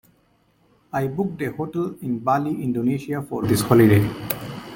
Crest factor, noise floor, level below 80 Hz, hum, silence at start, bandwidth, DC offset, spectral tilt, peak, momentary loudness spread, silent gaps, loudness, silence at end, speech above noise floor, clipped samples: 20 dB; -62 dBFS; -52 dBFS; none; 0.95 s; 17 kHz; under 0.1%; -7 dB/octave; -2 dBFS; 13 LU; none; -22 LUFS; 0 s; 41 dB; under 0.1%